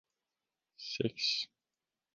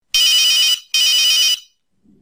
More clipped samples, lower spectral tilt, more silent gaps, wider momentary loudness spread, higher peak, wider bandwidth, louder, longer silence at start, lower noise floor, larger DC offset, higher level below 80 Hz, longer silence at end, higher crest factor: neither; first, -3.5 dB/octave vs 5 dB/octave; neither; first, 12 LU vs 4 LU; second, -18 dBFS vs -2 dBFS; second, 10 kHz vs 16 kHz; second, -35 LUFS vs -12 LUFS; first, 0.8 s vs 0.15 s; first, under -90 dBFS vs -56 dBFS; neither; second, -78 dBFS vs -60 dBFS; about the same, 0.7 s vs 0.6 s; first, 24 dB vs 14 dB